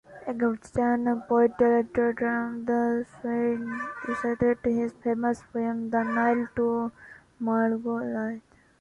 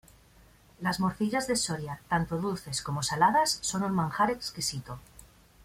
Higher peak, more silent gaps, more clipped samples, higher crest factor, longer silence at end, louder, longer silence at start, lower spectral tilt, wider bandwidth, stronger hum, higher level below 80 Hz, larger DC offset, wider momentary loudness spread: about the same, -10 dBFS vs -12 dBFS; neither; neither; about the same, 16 dB vs 20 dB; about the same, 0.4 s vs 0.4 s; about the same, -27 LUFS vs -29 LUFS; second, 0.1 s vs 0.8 s; first, -8 dB/octave vs -4 dB/octave; second, 8.6 kHz vs 16 kHz; neither; about the same, -58 dBFS vs -56 dBFS; neither; about the same, 9 LU vs 10 LU